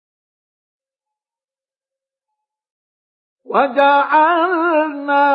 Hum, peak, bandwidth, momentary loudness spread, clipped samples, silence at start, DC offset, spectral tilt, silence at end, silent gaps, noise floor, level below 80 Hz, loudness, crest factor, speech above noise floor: none; 0 dBFS; 5.4 kHz; 5 LU; under 0.1%; 3.5 s; under 0.1%; -6.5 dB/octave; 0 s; none; under -90 dBFS; -84 dBFS; -14 LUFS; 18 dB; over 76 dB